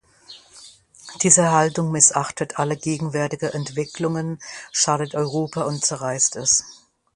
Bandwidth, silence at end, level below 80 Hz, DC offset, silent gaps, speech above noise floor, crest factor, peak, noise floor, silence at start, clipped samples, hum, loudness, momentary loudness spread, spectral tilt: 11.5 kHz; 0.4 s; -60 dBFS; under 0.1%; none; 26 dB; 22 dB; 0 dBFS; -47 dBFS; 0.3 s; under 0.1%; none; -20 LUFS; 12 LU; -3.5 dB/octave